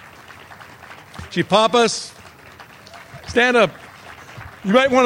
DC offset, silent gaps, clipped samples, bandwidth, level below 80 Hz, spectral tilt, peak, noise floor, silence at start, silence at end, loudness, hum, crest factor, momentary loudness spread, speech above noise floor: under 0.1%; none; under 0.1%; 16.5 kHz; -52 dBFS; -4 dB/octave; 0 dBFS; -43 dBFS; 0.3 s; 0 s; -17 LUFS; none; 20 dB; 25 LU; 27 dB